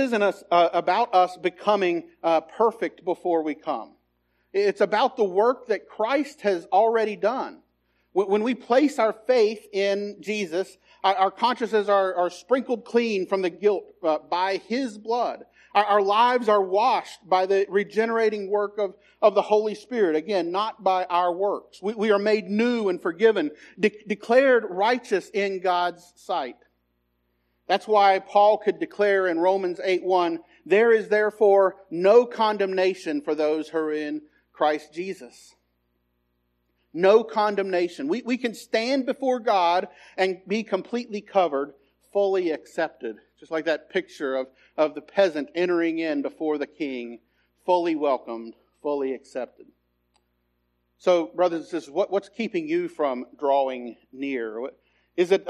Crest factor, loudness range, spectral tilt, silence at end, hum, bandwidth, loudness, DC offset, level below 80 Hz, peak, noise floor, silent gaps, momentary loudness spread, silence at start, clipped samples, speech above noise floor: 18 dB; 6 LU; -5 dB/octave; 0 s; 60 Hz at -60 dBFS; 12 kHz; -24 LUFS; under 0.1%; -76 dBFS; -4 dBFS; -72 dBFS; none; 11 LU; 0 s; under 0.1%; 49 dB